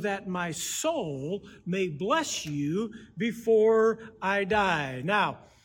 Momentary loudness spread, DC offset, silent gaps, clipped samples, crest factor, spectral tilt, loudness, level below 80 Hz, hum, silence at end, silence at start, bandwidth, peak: 10 LU; under 0.1%; none; under 0.1%; 16 dB; -4 dB/octave; -28 LUFS; -60 dBFS; none; 0.25 s; 0 s; 17.5 kHz; -12 dBFS